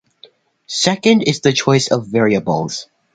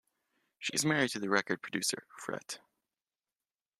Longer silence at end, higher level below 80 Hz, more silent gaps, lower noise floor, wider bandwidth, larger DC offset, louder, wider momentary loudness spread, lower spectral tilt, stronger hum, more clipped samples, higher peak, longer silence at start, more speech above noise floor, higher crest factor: second, 0.3 s vs 1.25 s; first, -54 dBFS vs -78 dBFS; neither; second, -48 dBFS vs under -90 dBFS; second, 9.4 kHz vs 14.5 kHz; neither; first, -15 LUFS vs -33 LUFS; about the same, 10 LU vs 12 LU; first, -4.5 dB/octave vs -3 dB/octave; neither; neither; first, 0 dBFS vs -12 dBFS; about the same, 0.7 s vs 0.6 s; second, 33 dB vs over 56 dB; second, 16 dB vs 24 dB